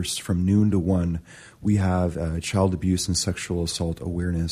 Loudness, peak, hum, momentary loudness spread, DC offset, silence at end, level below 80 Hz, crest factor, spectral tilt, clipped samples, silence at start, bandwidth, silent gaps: -24 LUFS; -10 dBFS; none; 7 LU; under 0.1%; 0 s; -40 dBFS; 14 dB; -5.5 dB/octave; under 0.1%; 0 s; 15 kHz; none